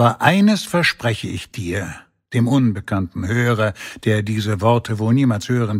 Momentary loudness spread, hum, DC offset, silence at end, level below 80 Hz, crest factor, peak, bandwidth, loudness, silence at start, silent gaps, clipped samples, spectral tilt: 10 LU; none; under 0.1%; 0 s; -50 dBFS; 18 dB; 0 dBFS; 15.5 kHz; -19 LUFS; 0 s; none; under 0.1%; -6 dB/octave